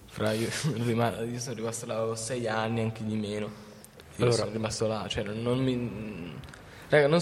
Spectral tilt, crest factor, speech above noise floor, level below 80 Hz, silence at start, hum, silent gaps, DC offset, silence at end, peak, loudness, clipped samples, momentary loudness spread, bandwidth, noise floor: -5 dB/octave; 20 dB; 21 dB; -58 dBFS; 0 s; none; none; under 0.1%; 0 s; -8 dBFS; -30 LUFS; under 0.1%; 16 LU; 15.5 kHz; -49 dBFS